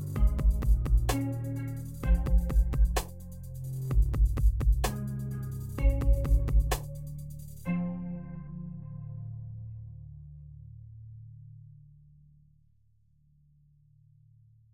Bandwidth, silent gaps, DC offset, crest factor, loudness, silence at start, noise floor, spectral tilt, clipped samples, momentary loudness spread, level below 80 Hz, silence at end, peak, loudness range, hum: 16.5 kHz; none; under 0.1%; 16 dB; -31 LUFS; 0 s; -67 dBFS; -6.5 dB/octave; under 0.1%; 21 LU; -30 dBFS; 2.95 s; -12 dBFS; 19 LU; none